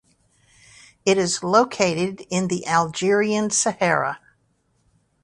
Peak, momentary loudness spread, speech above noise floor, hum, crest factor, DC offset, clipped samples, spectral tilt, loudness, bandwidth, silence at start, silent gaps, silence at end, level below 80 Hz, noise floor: -2 dBFS; 7 LU; 46 dB; none; 20 dB; under 0.1%; under 0.1%; -3.5 dB/octave; -21 LUFS; 11.5 kHz; 1.05 s; none; 1.05 s; -62 dBFS; -66 dBFS